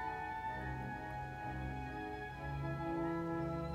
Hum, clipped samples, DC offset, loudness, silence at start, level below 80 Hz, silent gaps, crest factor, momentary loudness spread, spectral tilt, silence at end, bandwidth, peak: none; under 0.1%; under 0.1%; -42 LUFS; 0 s; -54 dBFS; none; 12 dB; 5 LU; -8 dB/octave; 0 s; 14 kHz; -28 dBFS